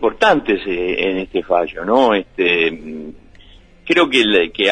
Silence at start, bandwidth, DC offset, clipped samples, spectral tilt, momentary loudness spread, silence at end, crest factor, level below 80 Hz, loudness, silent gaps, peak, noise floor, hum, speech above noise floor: 0 s; 10 kHz; under 0.1%; under 0.1%; -4.5 dB/octave; 17 LU; 0 s; 16 dB; -44 dBFS; -16 LUFS; none; -2 dBFS; -44 dBFS; none; 28 dB